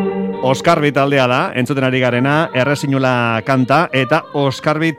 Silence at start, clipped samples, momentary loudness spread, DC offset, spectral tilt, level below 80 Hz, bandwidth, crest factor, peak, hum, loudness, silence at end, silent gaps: 0 s; under 0.1%; 4 LU; under 0.1%; -6 dB/octave; -56 dBFS; 15 kHz; 14 dB; 0 dBFS; none; -15 LUFS; 0 s; none